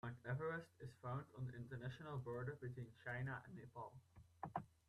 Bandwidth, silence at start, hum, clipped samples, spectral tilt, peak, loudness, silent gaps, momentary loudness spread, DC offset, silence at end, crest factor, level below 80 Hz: 11.5 kHz; 0.05 s; none; under 0.1%; -8 dB/octave; -30 dBFS; -51 LUFS; none; 10 LU; under 0.1%; 0.2 s; 20 dB; -74 dBFS